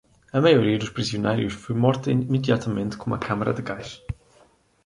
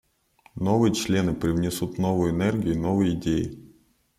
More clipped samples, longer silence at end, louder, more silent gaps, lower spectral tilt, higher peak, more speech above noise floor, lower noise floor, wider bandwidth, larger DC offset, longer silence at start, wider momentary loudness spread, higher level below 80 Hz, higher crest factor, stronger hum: neither; first, 0.7 s vs 0.5 s; about the same, -23 LUFS vs -25 LUFS; neither; about the same, -6.5 dB/octave vs -6.5 dB/octave; first, -4 dBFS vs -8 dBFS; about the same, 36 dB vs 37 dB; about the same, -58 dBFS vs -60 dBFS; second, 11 kHz vs 15 kHz; neither; second, 0.35 s vs 0.55 s; first, 16 LU vs 6 LU; about the same, -50 dBFS vs -48 dBFS; about the same, 20 dB vs 16 dB; neither